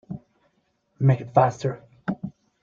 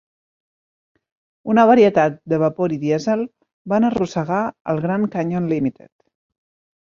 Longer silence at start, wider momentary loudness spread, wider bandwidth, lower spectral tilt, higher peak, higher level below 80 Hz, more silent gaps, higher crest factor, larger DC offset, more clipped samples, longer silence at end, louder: second, 0.1 s vs 1.45 s; first, 19 LU vs 10 LU; about the same, 7.2 kHz vs 7.4 kHz; about the same, -8.5 dB/octave vs -7.5 dB/octave; about the same, -4 dBFS vs -2 dBFS; about the same, -60 dBFS vs -58 dBFS; second, none vs 3.53-3.65 s, 4.61-4.65 s; about the same, 22 dB vs 18 dB; neither; neither; second, 0.3 s vs 1.1 s; second, -24 LUFS vs -19 LUFS